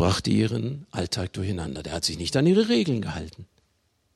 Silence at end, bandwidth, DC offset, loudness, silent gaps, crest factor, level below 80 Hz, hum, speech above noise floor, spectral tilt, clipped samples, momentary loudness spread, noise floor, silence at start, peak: 0.7 s; 13 kHz; under 0.1%; -25 LUFS; none; 16 dB; -52 dBFS; none; 45 dB; -5.5 dB/octave; under 0.1%; 11 LU; -70 dBFS; 0 s; -8 dBFS